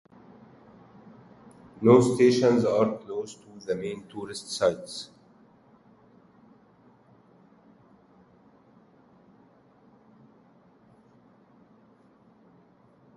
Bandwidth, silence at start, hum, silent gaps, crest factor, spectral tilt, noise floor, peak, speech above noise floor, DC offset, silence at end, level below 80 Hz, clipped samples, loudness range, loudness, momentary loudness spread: 11.5 kHz; 1.8 s; none; none; 24 dB; -6 dB/octave; -59 dBFS; -6 dBFS; 35 dB; under 0.1%; 8.1 s; -68 dBFS; under 0.1%; 11 LU; -25 LUFS; 20 LU